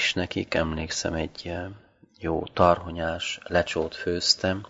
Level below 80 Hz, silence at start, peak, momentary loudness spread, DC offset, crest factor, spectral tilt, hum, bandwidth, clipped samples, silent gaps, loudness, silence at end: -46 dBFS; 0 s; -4 dBFS; 12 LU; under 0.1%; 24 dB; -4 dB/octave; none; 8 kHz; under 0.1%; none; -26 LUFS; 0.05 s